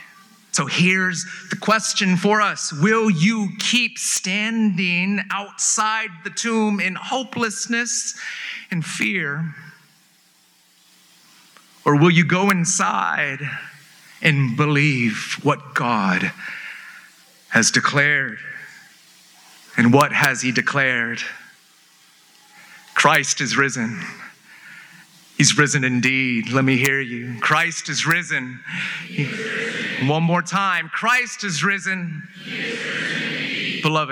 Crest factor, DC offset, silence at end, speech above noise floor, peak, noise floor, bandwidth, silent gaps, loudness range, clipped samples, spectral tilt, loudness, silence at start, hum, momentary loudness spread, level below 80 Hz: 20 dB; under 0.1%; 0 s; 37 dB; 0 dBFS; -57 dBFS; over 20 kHz; none; 4 LU; under 0.1%; -3.5 dB/octave; -19 LUFS; 0 s; none; 12 LU; -74 dBFS